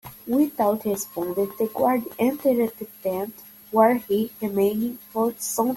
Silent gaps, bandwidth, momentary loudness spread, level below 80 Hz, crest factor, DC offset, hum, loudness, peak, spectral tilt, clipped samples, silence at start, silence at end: none; 17 kHz; 9 LU; -64 dBFS; 18 dB; under 0.1%; none; -24 LUFS; -4 dBFS; -5 dB/octave; under 0.1%; 0.05 s; 0 s